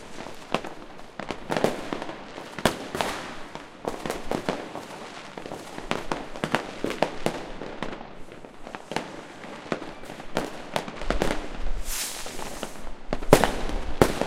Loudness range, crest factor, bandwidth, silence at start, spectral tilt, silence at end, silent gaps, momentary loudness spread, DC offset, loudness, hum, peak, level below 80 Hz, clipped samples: 6 LU; 28 dB; 16.5 kHz; 0 s; -4 dB/octave; 0 s; none; 14 LU; under 0.1%; -30 LUFS; none; 0 dBFS; -38 dBFS; under 0.1%